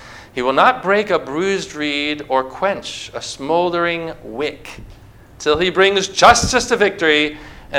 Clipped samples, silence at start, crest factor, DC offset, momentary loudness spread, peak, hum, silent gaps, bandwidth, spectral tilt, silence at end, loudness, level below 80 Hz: under 0.1%; 0 s; 18 dB; under 0.1%; 15 LU; 0 dBFS; none; none; 16 kHz; -3 dB/octave; 0 s; -16 LUFS; -42 dBFS